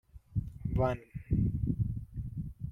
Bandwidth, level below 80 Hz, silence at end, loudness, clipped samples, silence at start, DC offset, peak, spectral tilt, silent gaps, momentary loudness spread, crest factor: 6.2 kHz; -42 dBFS; 0 s; -35 LUFS; under 0.1%; 0.15 s; under 0.1%; -16 dBFS; -10.5 dB/octave; none; 10 LU; 18 dB